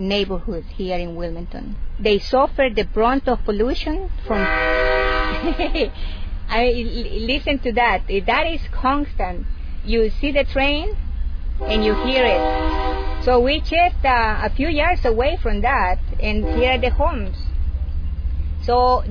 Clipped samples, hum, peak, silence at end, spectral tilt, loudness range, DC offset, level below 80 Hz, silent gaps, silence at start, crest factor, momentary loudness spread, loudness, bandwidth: under 0.1%; none; -4 dBFS; 0 s; -7 dB/octave; 3 LU; 0.2%; -24 dBFS; none; 0 s; 14 dB; 11 LU; -20 LUFS; 5.4 kHz